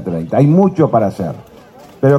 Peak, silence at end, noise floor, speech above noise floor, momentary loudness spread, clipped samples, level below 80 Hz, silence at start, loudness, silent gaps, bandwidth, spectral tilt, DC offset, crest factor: 0 dBFS; 0 s; -39 dBFS; 27 dB; 13 LU; under 0.1%; -50 dBFS; 0 s; -14 LUFS; none; 11.5 kHz; -10 dB/octave; under 0.1%; 14 dB